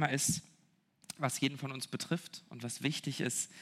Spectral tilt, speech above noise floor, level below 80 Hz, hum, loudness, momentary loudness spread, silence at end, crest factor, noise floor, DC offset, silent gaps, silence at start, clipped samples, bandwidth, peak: -3.5 dB/octave; 35 dB; -74 dBFS; none; -36 LUFS; 11 LU; 0 s; 24 dB; -71 dBFS; under 0.1%; none; 0 s; under 0.1%; 16 kHz; -14 dBFS